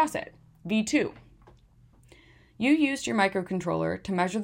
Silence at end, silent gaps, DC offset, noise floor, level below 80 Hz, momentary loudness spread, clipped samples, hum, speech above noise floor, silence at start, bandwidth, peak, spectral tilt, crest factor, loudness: 0 s; none; under 0.1%; -58 dBFS; -60 dBFS; 11 LU; under 0.1%; none; 31 dB; 0 s; 16 kHz; -10 dBFS; -5 dB/octave; 18 dB; -27 LUFS